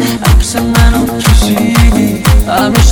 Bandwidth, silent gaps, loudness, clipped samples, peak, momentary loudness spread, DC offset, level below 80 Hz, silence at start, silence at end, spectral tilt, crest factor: over 20 kHz; none; -9 LUFS; 1%; 0 dBFS; 2 LU; under 0.1%; -12 dBFS; 0 s; 0 s; -5 dB/octave; 8 dB